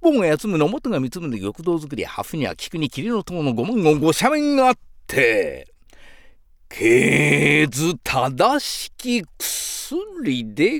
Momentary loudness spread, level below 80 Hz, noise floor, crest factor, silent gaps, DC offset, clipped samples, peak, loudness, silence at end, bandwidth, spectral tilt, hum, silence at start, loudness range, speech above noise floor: 12 LU; -48 dBFS; -48 dBFS; 16 dB; none; under 0.1%; under 0.1%; -4 dBFS; -20 LUFS; 0 s; 19.5 kHz; -4.5 dB/octave; none; 0 s; 5 LU; 28 dB